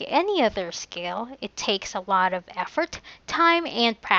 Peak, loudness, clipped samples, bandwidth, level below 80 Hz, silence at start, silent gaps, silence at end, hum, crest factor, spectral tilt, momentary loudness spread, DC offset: -4 dBFS; -25 LUFS; under 0.1%; 8 kHz; -58 dBFS; 0 s; none; 0 s; none; 22 dB; -3 dB/octave; 12 LU; under 0.1%